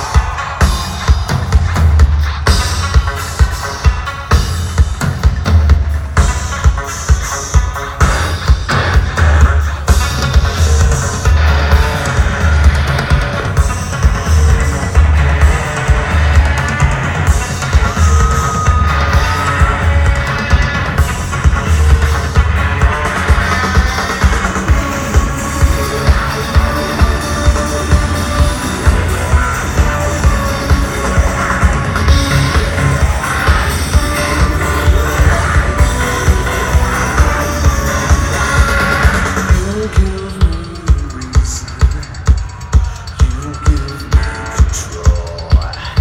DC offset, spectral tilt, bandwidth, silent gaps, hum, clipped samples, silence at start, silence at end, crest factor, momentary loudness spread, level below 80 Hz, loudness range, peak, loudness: under 0.1%; -5 dB/octave; 16.5 kHz; none; none; 0.2%; 0 s; 0 s; 12 dB; 4 LU; -14 dBFS; 2 LU; 0 dBFS; -13 LUFS